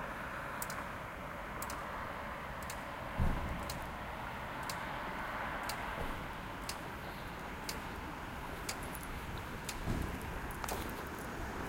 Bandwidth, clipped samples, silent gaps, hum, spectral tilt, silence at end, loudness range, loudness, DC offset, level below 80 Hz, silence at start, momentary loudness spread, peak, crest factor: 17 kHz; under 0.1%; none; none; -4.5 dB/octave; 0 s; 2 LU; -42 LUFS; under 0.1%; -48 dBFS; 0 s; 5 LU; -18 dBFS; 22 dB